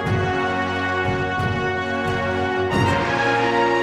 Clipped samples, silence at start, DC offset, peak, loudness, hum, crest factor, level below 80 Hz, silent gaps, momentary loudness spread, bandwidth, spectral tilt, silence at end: under 0.1%; 0 s; under 0.1%; -6 dBFS; -21 LUFS; none; 14 dB; -42 dBFS; none; 4 LU; 12.5 kHz; -6 dB/octave; 0 s